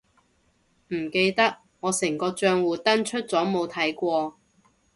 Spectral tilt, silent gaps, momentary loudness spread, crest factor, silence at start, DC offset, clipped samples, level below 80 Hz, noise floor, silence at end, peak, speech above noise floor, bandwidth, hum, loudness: -3.5 dB/octave; none; 7 LU; 18 dB; 0.9 s; under 0.1%; under 0.1%; -66 dBFS; -66 dBFS; 0.65 s; -8 dBFS; 42 dB; 12 kHz; none; -25 LUFS